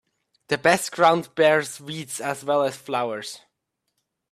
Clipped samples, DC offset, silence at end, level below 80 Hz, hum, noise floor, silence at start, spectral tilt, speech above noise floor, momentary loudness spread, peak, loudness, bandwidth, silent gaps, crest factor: under 0.1%; under 0.1%; 0.95 s; -68 dBFS; none; -78 dBFS; 0.5 s; -3.5 dB/octave; 55 dB; 14 LU; -4 dBFS; -22 LUFS; 15 kHz; none; 20 dB